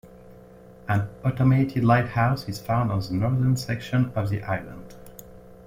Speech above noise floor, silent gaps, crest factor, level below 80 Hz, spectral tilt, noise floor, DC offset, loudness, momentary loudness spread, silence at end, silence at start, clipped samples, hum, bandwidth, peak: 24 dB; none; 18 dB; -50 dBFS; -7.5 dB/octave; -47 dBFS; under 0.1%; -24 LUFS; 21 LU; 0.05 s; 0.05 s; under 0.1%; none; 16 kHz; -6 dBFS